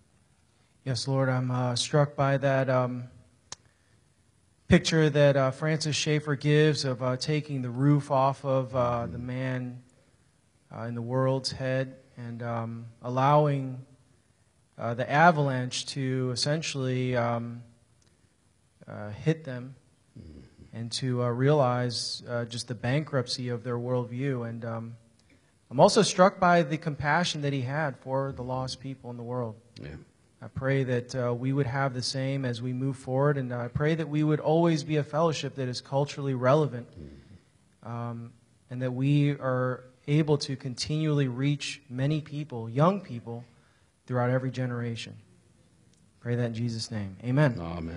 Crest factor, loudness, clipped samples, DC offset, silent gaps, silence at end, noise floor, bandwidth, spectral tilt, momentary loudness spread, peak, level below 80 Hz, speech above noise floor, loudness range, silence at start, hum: 22 dB; -28 LUFS; under 0.1%; under 0.1%; none; 0 s; -67 dBFS; 11 kHz; -6 dB/octave; 17 LU; -6 dBFS; -60 dBFS; 39 dB; 8 LU; 0.85 s; none